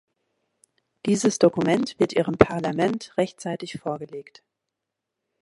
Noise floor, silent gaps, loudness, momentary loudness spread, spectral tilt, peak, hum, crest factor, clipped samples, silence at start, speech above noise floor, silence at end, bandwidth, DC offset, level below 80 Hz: -84 dBFS; none; -23 LUFS; 12 LU; -5.5 dB/octave; 0 dBFS; none; 24 dB; under 0.1%; 1.05 s; 61 dB; 1.2 s; 11.5 kHz; under 0.1%; -54 dBFS